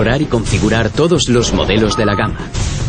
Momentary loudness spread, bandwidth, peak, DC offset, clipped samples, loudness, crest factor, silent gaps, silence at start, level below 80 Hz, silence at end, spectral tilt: 6 LU; 10 kHz; 0 dBFS; under 0.1%; under 0.1%; -14 LUFS; 12 dB; none; 0 s; -24 dBFS; 0 s; -5 dB/octave